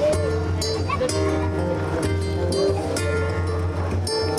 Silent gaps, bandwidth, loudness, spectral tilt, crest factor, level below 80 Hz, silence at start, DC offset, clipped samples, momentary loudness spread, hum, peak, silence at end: none; 13 kHz; -23 LUFS; -5.5 dB/octave; 12 dB; -42 dBFS; 0 s; under 0.1%; under 0.1%; 3 LU; none; -10 dBFS; 0 s